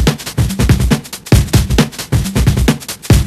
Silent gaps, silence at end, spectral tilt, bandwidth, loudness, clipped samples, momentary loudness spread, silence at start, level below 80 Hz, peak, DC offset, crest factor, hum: none; 0 s; -5.5 dB/octave; 15 kHz; -14 LUFS; 0.4%; 6 LU; 0 s; -18 dBFS; 0 dBFS; under 0.1%; 12 dB; none